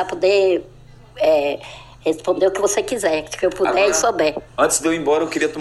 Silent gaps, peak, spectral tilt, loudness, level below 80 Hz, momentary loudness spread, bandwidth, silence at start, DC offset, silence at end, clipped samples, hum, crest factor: none; -2 dBFS; -2.5 dB/octave; -18 LUFS; -48 dBFS; 8 LU; 13.5 kHz; 0 s; under 0.1%; 0 s; under 0.1%; none; 16 dB